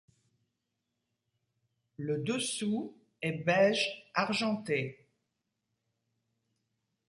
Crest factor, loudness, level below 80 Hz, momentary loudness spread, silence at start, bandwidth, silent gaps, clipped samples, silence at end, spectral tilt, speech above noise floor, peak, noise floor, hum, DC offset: 22 dB; -32 LUFS; -76 dBFS; 11 LU; 2 s; 11.5 kHz; none; under 0.1%; 2.15 s; -4.5 dB/octave; 53 dB; -14 dBFS; -85 dBFS; none; under 0.1%